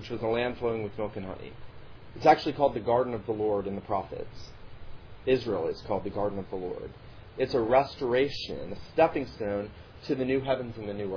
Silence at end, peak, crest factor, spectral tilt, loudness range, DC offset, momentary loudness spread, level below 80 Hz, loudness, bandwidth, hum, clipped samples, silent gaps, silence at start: 0 s; -8 dBFS; 22 dB; -4.5 dB/octave; 4 LU; under 0.1%; 18 LU; -52 dBFS; -29 LUFS; 5.4 kHz; none; under 0.1%; none; 0 s